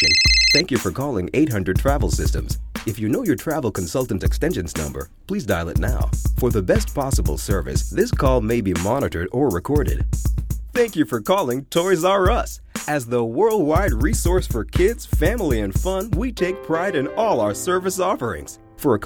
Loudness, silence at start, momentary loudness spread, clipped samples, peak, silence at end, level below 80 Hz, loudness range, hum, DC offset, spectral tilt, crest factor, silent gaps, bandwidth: -21 LUFS; 0 s; 7 LU; under 0.1%; -4 dBFS; 0 s; -28 dBFS; 3 LU; none; under 0.1%; -4.5 dB/octave; 16 dB; none; 19.5 kHz